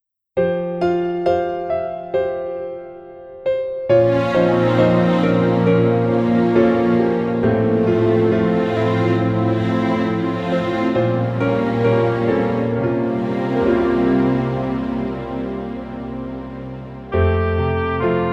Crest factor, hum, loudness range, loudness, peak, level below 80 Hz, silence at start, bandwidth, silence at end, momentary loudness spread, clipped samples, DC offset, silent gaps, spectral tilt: 14 dB; none; 6 LU; -18 LUFS; -4 dBFS; -40 dBFS; 0.35 s; 7.8 kHz; 0 s; 12 LU; under 0.1%; under 0.1%; none; -9 dB/octave